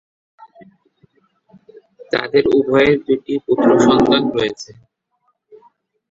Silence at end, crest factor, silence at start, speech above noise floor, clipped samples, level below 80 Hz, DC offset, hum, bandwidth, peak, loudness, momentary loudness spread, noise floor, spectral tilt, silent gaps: 1.45 s; 16 dB; 2 s; 52 dB; under 0.1%; -50 dBFS; under 0.1%; none; 7.8 kHz; -2 dBFS; -15 LUFS; 10 LU; -67 dBFS; -5.5 dB/octave; none